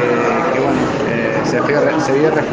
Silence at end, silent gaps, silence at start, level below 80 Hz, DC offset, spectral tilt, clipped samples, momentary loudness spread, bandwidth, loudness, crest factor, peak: 0 s; none; 0 s; -46 dBFS; under 0.1%; -6 dB/octave; under 0.1%; 2 LU; 9.4 kHz; -15 LUFS; 14 dB; -2 dBFS